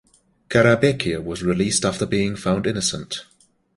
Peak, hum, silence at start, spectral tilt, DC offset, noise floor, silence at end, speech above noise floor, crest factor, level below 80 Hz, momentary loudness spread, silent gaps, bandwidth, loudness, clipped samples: -2 dBFS; none; 0.5 s; -4.5 dB/octave; under 0.1%; -40 dBFS; 0.55 s; 20 dB; 20 dB; -48 dBFS; 9 LU; none; 11.5 kHz; -20 LUFS; under 0.1%